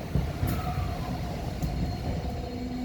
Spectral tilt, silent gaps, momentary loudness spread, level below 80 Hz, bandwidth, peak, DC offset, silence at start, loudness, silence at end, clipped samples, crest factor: -7 dB/octave; none; 5 LU; -36 dBFS; over 20 kHz; -14 dBFS; under 0.1%; 0 s; -32 LUFS; 0 s; under 0.1%; 16 dB